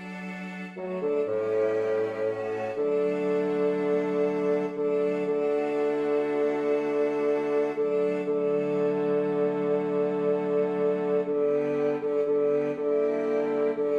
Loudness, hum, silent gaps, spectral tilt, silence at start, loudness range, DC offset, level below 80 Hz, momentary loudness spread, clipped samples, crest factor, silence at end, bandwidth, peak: -27 LUFS; none; none; -8 dB/octave; 0 s; 1 LU; under 0.1%; -72 dBFS; 3 LU; under 0.1%; 10 dB; 0 s; 7.4 kHz; -16 dBFS